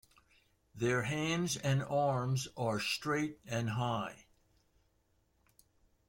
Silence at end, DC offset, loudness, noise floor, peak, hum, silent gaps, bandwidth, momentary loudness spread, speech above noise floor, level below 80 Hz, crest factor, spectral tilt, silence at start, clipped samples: 1.9 s; under 0.1%; -35 LUFS; -75 dBFS; -20 dBFS; none; none; 16.5 kHz; 5 LU; 40 dB; -66 dBFS; 16 dB; -5 dB/octave; 0.75 s; under 0.1%